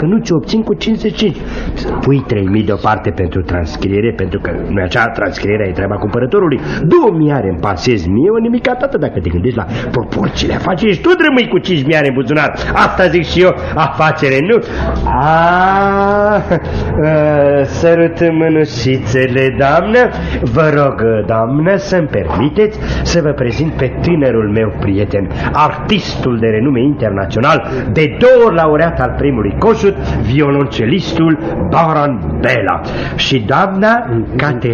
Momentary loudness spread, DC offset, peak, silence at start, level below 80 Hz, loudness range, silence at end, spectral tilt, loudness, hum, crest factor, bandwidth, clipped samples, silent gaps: 6 LU; under 0.1%; 0 dBFS; 0 s; -28 dBFS; 3 LU; 0 s; -7 dB/octave; -12 LUFS; none; 12 dB; 7.2 kHz; under 0.1%; none